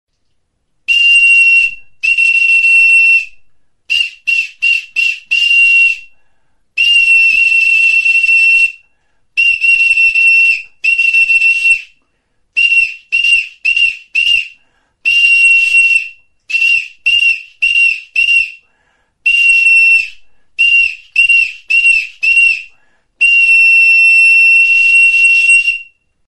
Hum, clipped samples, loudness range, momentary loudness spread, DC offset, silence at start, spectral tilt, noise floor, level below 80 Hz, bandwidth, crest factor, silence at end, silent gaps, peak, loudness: none; under 0.1%; 5 LU; 9 LU; under 0.1%; 0.9 s; 4 dB/octave; -63 dBFS; -50 dBFS; 11.5 kHz; 10 dB; 0.5 s; none; 0 dBFS; -7 LUFS